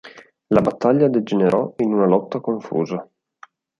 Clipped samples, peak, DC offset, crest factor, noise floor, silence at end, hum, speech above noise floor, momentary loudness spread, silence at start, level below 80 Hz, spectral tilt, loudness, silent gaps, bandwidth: under 0.1%; -2 dBFS; under 0.1%; 18 dB; -49 dBFS; 0.75 s; none; 31 dB; 8 LU; 0.05 s; -58 dBFS; -8.5 dB/octave; -19 LUFS; none; 7.4 kHz